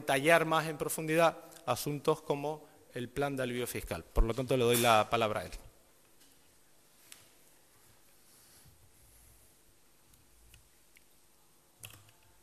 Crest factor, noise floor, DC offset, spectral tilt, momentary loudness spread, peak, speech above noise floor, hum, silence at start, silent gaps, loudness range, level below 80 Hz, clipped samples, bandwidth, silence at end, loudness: 26 dB; -67 dBFS; under 0.1%; -4 dB/octave; 21 LU; -8 dBFS; 36 dB; none; 0 s; none; 4 LU; -46 dBFS; under 0.1%; 14.5 kHz; 0.45 s; -31 LUFS